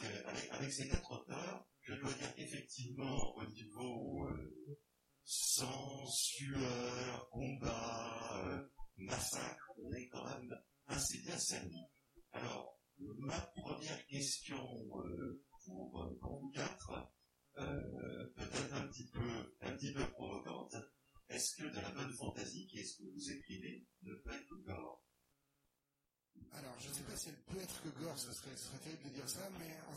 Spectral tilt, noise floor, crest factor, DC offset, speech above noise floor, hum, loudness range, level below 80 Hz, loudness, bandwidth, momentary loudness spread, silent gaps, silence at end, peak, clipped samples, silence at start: -3.5 dB/octave; -89 dBFS; 24 dB; under 0.1%; 43 dB; none; 10 LU; -60 dBFS; -45 LUFS; 16.5 kHz; 13 LU; none; 0 s; -22 dBFS; under 0.1%; 0 s